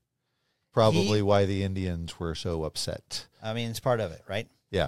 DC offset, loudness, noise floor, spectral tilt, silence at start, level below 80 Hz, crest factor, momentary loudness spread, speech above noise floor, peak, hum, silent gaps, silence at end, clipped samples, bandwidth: under 0.1%; -29 LUFS; -78 dBFS; -5.5 dB/octave; 0.75 s; -50 dBFS; 20 dB; 12 LU; 50 dB; -8 dBFS; none; none; 0 s; under 0.1%; 14.5 kHz